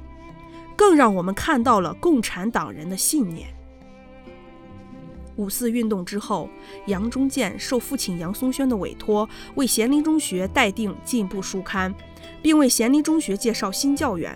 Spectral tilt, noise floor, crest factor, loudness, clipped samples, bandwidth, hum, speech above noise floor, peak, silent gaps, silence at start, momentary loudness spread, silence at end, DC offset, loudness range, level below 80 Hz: -4 dB/octave; -44 dBFS; 20 dB; -22 LUFS; under 0.1%; 18 kHz; none; 23 dB; -2 dBFS; none; 0 s; 19 LU; 0 s; under 0.1%; 8 LU; -46 dBFS